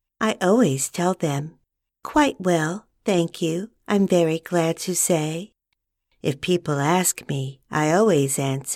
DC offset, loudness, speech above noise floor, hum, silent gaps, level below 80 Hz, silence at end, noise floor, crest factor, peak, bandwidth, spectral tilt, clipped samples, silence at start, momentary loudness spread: under 0.1%; -22 LUFS; 56 dB; none; none; -58 dBFS; 0 s; -78 dBFS; 16 dB; -6 dBFS; 16 kHz; -4.5 dB/octave; under 0.1%; 0.2 s; 10 LU